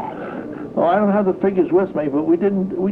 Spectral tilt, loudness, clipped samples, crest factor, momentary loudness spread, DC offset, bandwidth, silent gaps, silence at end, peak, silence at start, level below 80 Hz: -10 dB/octave; -18 LUFS; under 0.1%; 12 dB; 12 LU; under 0.1%; 4.3 kHz; none; 0 s; -6 dBFS; 0 s; -56 dBFS